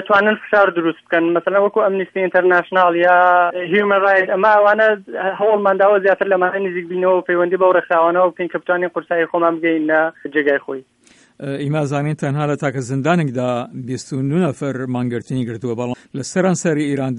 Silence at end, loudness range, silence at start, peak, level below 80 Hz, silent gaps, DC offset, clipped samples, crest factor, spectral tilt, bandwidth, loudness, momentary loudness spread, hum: 0 s; 7 LU; 0 s; 0 dBFS; -64 dBFS; none; under 0.1%; under 0.1%; 16 dB; -6 dB/octave; 11 kHz; -16 LUFS; 10 LU; none